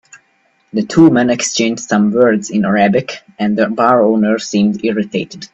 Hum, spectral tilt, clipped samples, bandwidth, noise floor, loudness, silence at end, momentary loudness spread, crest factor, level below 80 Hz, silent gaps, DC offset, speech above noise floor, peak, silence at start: none; -5 dB/octave; under 0.1%; 8.4 kHz; -58 dBFS; -13 LUFS; 0.05 s; 10 LU; 14 dB; -54 dBFS; none; under 0.1%; 45 dB; 0 dBFS; 0.15 s